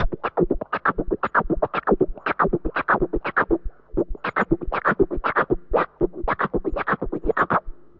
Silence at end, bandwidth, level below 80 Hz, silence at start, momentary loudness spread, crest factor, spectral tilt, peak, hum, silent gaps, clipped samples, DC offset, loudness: 0.1 s; 5.4 kHz; -34 dBFS; 0 s; 4 LU; 18 dB; -9 dB/octave; -6 dBFS; none; none; under 0.1%; under 0.1%; -23 LUFS